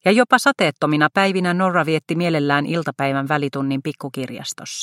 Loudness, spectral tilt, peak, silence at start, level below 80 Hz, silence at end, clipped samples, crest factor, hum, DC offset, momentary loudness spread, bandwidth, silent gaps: -19 LUFS; -5 dB/octave; 0 dBFS; 0.05 s; -64 dBFS; 0 s; under 0.1%; 18 dB; none; under 0.1%; 13 LU; 16 kHz; none